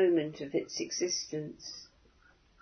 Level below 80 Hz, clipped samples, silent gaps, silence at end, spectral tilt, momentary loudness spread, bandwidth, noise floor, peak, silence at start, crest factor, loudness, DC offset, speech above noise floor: -70 dBFS; under 0.1%; none; 0.75 s; -3.5 dB/octave; 13 LU; 6.6 kHz; -64 dBFS; -18 dBFS; 0 s; 16 dB; -34 LUFS; under 0.1%; 31 dB